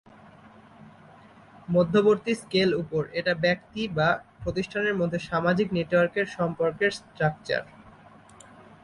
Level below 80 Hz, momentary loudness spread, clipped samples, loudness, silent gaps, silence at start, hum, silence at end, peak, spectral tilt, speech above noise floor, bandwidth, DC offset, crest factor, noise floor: -56 dBFS; 8 LU; under 0.1%; -26 LUFS; none; 0.8 s; none; 0.95 s; -10 dBFS; -6 dB/octave; 26 dB; 11.5 kHz; under 0.1%; 16 dB; -51 dBFS